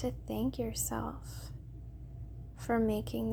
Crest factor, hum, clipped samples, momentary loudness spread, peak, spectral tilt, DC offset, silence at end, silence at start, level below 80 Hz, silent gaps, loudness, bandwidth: 16 dB; none; under 0.1%; 16 LU; -20 dBFS; -5.5 dB/octave; under 0.1%; 0 s; 0 s; -48 dBFS; none; -36 LUFS; over 20 kHz